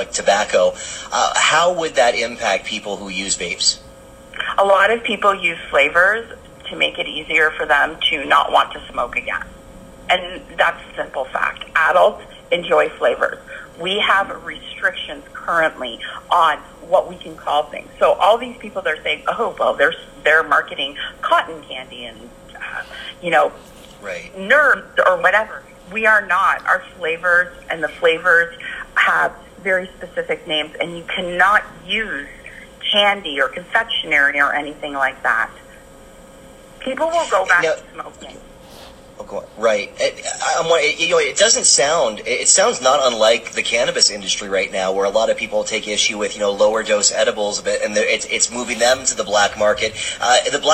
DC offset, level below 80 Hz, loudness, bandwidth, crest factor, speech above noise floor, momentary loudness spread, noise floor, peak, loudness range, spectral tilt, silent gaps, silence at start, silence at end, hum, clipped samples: under 0.1%; -48 dBFS; -17 LUFS; 15.5 kHz; 18 dB; 24 dB; 15 LU; -42 dBFS; 0 dBFS; 5 LU; -1 dB/octave; none; 0 s; 0 s; none; under 0.1%